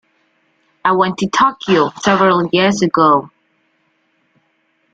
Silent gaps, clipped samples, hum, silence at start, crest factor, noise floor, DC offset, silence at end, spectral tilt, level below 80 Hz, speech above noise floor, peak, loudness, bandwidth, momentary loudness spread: none; under 0.1%; none; 0.85 s; 16 dB; -62 dBFS; under 0.1%; 1.65 s; -5 dB/octave; -56 dBFS; 49 dB; -2 dBFS; -14 LUFS; 9 kHz; 4 LU